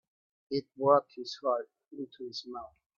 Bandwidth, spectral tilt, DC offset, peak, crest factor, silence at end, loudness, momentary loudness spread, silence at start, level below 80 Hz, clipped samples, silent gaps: 7.4 kHz; -6 dB/octave; under 0.1%; -12 dBFS; 22 dB; 0.35 s; -32 LUFS; 18 LU; 0.5 s; -78 dBFS; under 0.1%; none